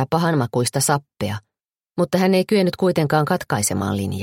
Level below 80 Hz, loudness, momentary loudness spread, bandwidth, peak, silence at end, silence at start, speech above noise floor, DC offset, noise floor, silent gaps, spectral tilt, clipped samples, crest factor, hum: -56 dBFS; -20 LUFS; 10 LU; 16.5 kHz; -4 dBFS; 0 s; 0 s; 35 dB; under 0.1%; -54 dBFS; 1.65-1.69 s; -5 dB/octave; under 0.1%; 16 dB; none